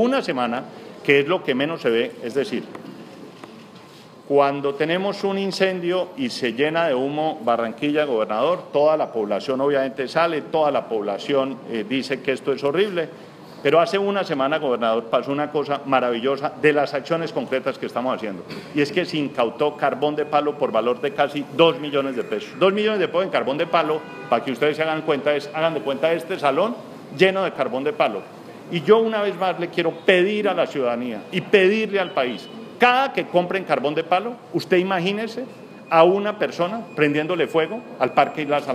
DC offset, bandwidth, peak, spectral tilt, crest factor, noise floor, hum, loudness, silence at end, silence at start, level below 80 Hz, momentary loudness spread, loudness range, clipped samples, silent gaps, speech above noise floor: under 0.1%; 14.5 kHz; -2 dBFS; -5.5 dB/octave; 20 dB; -44 dBFS; none; -21 LUFS; 0 s; 0 s; -74 dBFS; 10 LU; 3 LU; under 0.1%; none; 23 dB